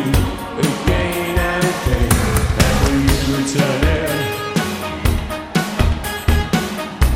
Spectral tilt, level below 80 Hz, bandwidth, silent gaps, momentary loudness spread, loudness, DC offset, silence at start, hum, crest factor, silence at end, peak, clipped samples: -5 dB/octave; -22 dBFS; 16.5 kHz; none; 5 LU; -18 LUFS; 0.1%; 0 s; none; 16 dB; 0 s; 0 dBFS; under 0.1%